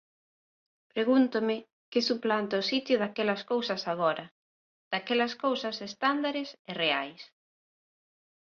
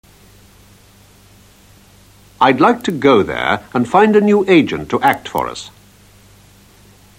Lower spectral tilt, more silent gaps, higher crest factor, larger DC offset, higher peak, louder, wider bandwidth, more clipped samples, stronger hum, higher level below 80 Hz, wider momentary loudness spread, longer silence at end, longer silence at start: second, -4.5 dB/octave vs -6 dB/octave; first, 1.73-1.92 s, 4.31-4.91 s, 6.59-6.65 s vs none; about the same, 20 dB vs 16 dB; neither; second, -12 dBFS vs 0 dBFS; second, -29 LUFS vs -14 LUFS; second, 7 kHz vs 16.5 kHz; neither; second, none vs 50 Hz at -45 dBFS; second, -78 dBFS vs -50 dBFS; about the same, 10 LU vs 11 LU; second, 1.2 s vs 1.5 s; second, 0.95 s vs 2.4 s